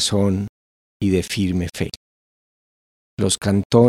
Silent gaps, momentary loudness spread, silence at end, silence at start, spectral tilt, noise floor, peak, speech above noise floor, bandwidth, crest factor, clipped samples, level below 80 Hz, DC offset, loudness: 0.49-1.00 s, 1.97-3.17 s, 3.65-3.70 s; 13 LU; 0 s; 0 s; -5.5 dB/octave; under -90 dBFS; 0 dBFS; over 72 dB; 14.5 kHz; 20 dB; under 0.1%; -50 dBFS; under 0.1%; -21 LUFS